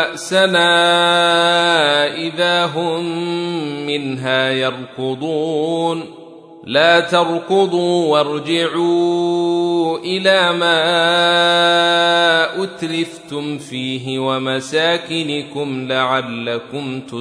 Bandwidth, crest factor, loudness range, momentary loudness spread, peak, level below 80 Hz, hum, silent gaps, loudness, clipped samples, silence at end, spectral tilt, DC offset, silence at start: 11 kHz; 16 dB; 6 LU; 11 LU; -2 dBFS; -68 dBFS; none; none; -16 LUFS; under 0.1%; 0 s; -4 dB/octave; under 0.1%; 0 s